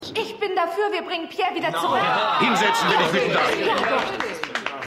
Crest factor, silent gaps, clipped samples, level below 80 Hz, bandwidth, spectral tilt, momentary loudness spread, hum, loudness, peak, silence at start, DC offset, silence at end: 16 dB; none; under 0.1%; -62 dBFS; 16 kHz; -3.5 dB/octave; 9 LU; none; -21 LUFS; -6 dBFS; 0 s; under 0.1%; 0 s